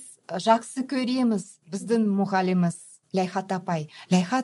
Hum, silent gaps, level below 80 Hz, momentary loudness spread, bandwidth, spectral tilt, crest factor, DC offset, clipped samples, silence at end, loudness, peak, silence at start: none; none; -74 dBFS; 9 LU; 11.5 kHz; -6 dB/octave; 18 dB; under 0.1%; under 0.1%; 0 s; -26 LUFS; -6 dBFS; 0 s